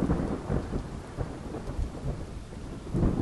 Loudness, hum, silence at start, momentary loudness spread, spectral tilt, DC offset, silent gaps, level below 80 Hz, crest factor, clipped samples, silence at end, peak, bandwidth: -34 LUFS; none; 0 s; 11 LU; -8 dB/octave; under 0.1%; none; -36 dBFS; 18 dB; under 0.1%; 0 s; -14 dBFS; 11.5 kHz